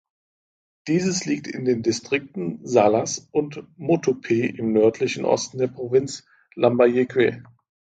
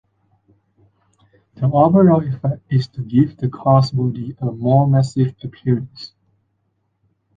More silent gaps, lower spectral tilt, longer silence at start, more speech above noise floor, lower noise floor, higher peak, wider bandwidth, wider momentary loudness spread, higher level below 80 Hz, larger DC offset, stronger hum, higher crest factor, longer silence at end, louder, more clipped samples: neither; second, -5 dB/octave vs -9.5 dB/octave; second, 0.85 s vs 1.6 s; first, over 68 dB vs 52 dB; first, under -90 dBFS vs -68 dBFS; about the same, -2 dBFS vs -2 dBFS; first, 9.2 kHz vs 7.6 kHz; about the same, 12 LU vs 12 LU; second, -62 dBFS vs -52 dBFS; neither; neither; about the same, 20 dB vs 16 dB; second, 0.55 s vs 1.3 s; second, -22 LUFS vs -17 LUFS; neither